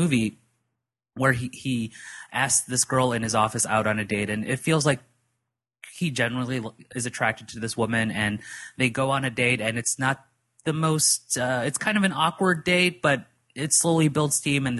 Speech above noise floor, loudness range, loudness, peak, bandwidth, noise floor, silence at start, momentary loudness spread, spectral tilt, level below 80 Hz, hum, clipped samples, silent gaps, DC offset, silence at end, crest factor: 57 dB; 5 LU; -24 LUFS; -6 dBFS; 12.5 kHz; -82 dBFS; 0 s; 11 LU; -3.5 dB/octave; -58 dBFS; none; under 0.1%; none; under 0.1%; 0 s; 20 dB